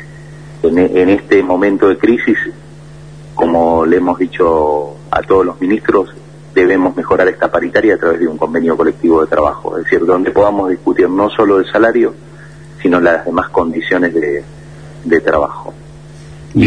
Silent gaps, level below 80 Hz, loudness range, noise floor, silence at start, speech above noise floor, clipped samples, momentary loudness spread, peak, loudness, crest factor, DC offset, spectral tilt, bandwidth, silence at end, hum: none; -40 dBFS; 2 LU; -34 dBFS; 0 s; 22 dB; under 0.1%; 8 LU; 0 dBFS; -12 LUFS; 12 dB; 0.5%; -7.5 dB/octave; 10 kHz; 0 s; none